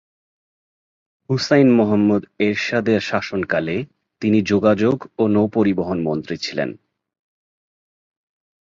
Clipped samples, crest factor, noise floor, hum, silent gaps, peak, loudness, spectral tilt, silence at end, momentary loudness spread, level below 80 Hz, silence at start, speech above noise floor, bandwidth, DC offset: under 0.1%; 18 dB; under -90 dBFS; none; none; -2 dBFS; -19 LUFS; -6.5 dB/octave; 1.9 s; 10 LU; -54 dBFS; 1.3 s; over 72 dB; 7.6 kHz; under 0.1%